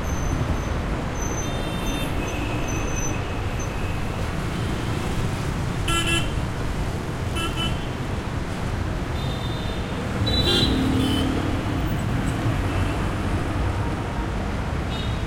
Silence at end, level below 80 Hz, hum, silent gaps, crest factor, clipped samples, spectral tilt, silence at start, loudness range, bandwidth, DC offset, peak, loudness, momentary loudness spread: 0 s; -30 dBFS; none; none; 16 dB; under 0.1%; -5 dB/octave; 0 s; 4 LU; 16.5 kHz; under 0.1%; -8 dBFS; -25 LUFS; 6 LU